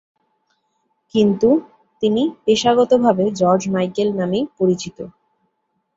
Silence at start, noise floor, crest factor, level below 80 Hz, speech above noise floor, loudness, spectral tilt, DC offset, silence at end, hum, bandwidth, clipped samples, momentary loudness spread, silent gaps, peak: 1.15 s; -71 dBFS; 16 dB; -58 dBFS; 54 dB; -17 LUFS; -6 dB/octave; under 0.1%; 0.85 s; none; 8 kHz; under 0.1%; 9 LU; none; -2 dBFS